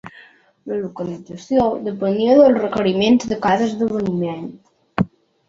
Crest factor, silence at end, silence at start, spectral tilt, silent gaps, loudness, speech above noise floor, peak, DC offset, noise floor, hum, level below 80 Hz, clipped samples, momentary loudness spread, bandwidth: 16 dB; 0.4 s; 0.05 s; -6.5 dB/octave; none; -18 LUFS; 31 dB; -2 dBFS; under 0.1%; -48 dBFS; none; -52 dBFS; under 0.1%; 16 LU; 7.6 kHz